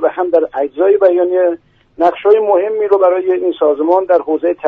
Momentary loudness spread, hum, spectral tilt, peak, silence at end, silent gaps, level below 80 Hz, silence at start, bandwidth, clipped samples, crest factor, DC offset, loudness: 5 LU; none; -7 dB/octave; 0 dBFS; 0 s; none; -58 dBFS; 0 s; 4.7 kHz; under 0.1%; 12 dB; under 0.1%; -13 LUFS